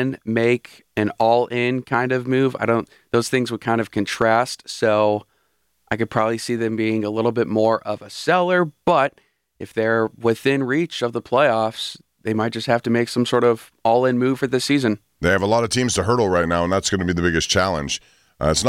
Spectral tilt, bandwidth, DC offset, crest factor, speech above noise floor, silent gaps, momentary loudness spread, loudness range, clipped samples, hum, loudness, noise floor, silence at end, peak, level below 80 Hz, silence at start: -5 dB/octave; 16 kHz; under 0.1%; 16 dB; 48 dB; none; 7 LU; 2 LU; under 0.1%; none; -20 LUFS; -68 dBFS; 0 s; -4 dBFS; -46 dBFS; 0 s